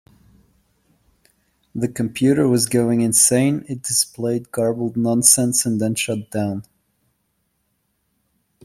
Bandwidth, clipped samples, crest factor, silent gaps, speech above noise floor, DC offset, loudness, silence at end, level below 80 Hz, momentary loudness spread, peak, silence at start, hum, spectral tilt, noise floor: 16 kHz; under 0.1%; 20 dB; none; 51 dB; under 0.1%; -18 LUFS; 2 s; -58 dBFS; 12 LU; 0 dBFS; 1.75 s; none; -4 dB/octave; -70 dBFS